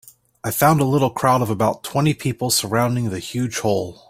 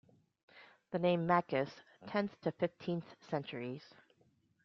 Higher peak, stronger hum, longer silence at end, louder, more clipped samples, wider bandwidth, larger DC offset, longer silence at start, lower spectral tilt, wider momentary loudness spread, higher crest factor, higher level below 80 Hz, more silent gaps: first, -2 dBFS vs -18 dBFS; neither; second, 0.15 s vs 0.85 s; first, -19 LUFS vs -37 LUFS; neither; first, 16 kHz vs 6.4 kHz; neither; about the same, 0.45 s vs 0.55 s; about the same, -5 dB/octave vs -5.5 dB/octave; second, 8 LU vs 12 LU; about the same, 18 dB vs 22 dB; first, -52 dBFS vs -78 dBFS; neither